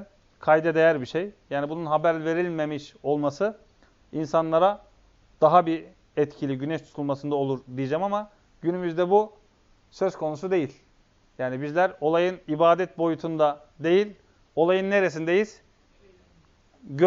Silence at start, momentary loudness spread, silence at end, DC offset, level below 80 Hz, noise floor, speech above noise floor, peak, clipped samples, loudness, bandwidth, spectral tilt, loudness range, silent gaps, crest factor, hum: 0 s; 11 LU; 0 s; under 0.1%; -64 dBFS; -61 dBFS; 37 dB; -4 dBFS; under 0.1%; -25 LUFS; 7.6 kHz; -5 dB/octave; 4 LU; none; 22 dB; none